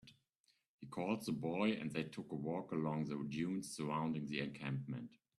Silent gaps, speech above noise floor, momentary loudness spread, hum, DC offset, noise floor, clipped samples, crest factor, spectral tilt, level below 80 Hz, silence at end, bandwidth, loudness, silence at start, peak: 0.35-0.44 s, 0.68-0.79 s; 39 dB; 7 LU; none; under 0.1%; -80 dBFS; under 0.1%; 20 dB; -6 dB/octave; -78 dBFS; 0.25 s; 13 kHz; -42 LUFS; 0.05 s; -22 dBFS